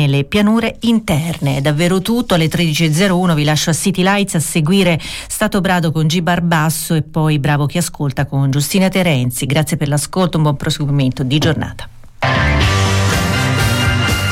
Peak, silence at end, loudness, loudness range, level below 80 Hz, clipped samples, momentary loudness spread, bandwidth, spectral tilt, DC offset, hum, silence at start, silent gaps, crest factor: -4 dBFS; 0 s; -15 LUFS; 2 LU; -32 dBFS; under 0.1%; 5 LU; 16.5 kHz; -5 dB/octave; under 0.1%; none; 0 s; none; 10 dB